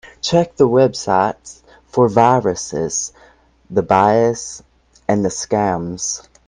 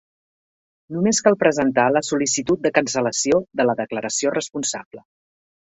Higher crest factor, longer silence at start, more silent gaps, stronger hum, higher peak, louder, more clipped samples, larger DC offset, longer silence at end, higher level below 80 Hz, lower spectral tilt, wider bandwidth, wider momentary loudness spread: about the same, 18 dB vs 20 dB; second, 0.05 s vs 0.9 s; second, none vs 4.85-4.91 s; neither; about the same, 0 dBFS vs 0 dBFS; first, -17 LUFS vs -20 LUFS; neither; neither; second, 0.25 s vs 0.8 s; first, -50 dBFS vs -60 dBFS; first, -5 dB/octave vs -3.5 dB/octave; first, 10.5 kHz vs 8.4 kHz; first, 12 LU vs 8 LU